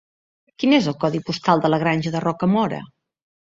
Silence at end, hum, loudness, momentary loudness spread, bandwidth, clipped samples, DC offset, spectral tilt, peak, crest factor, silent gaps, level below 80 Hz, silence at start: 0.6 s; none; -20 LUFS; 6 LU; 7.8 kHz; under 0.1%; under 0.1%; -6.5 dB/octave; -2 dBFS; 18 dB; none; -60 dBFS; 0.6 s